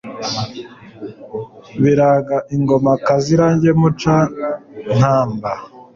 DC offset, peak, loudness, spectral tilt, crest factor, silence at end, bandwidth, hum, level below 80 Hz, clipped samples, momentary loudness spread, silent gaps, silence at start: under 0.1%; -2 dBFS; -16 LUFS; -7 dB/octave; 14 dB; 0.15 s; 7.4 kHz; none; -48 dBFS; under 0.1%; 16 LU; none; 0.05 s